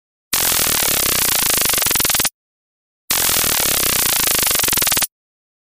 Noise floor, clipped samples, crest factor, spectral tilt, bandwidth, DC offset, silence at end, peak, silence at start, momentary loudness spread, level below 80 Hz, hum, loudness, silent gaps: under -90 dBFS; under 0.1%; 16 dB; 0 dB/octave; 16.5 kHz; under 0.1%; 0.6 s; -2 dBFS; 0.3 s; 4 LU; -40 dBFS; none; -14 LUFS; 2.34-3.08 s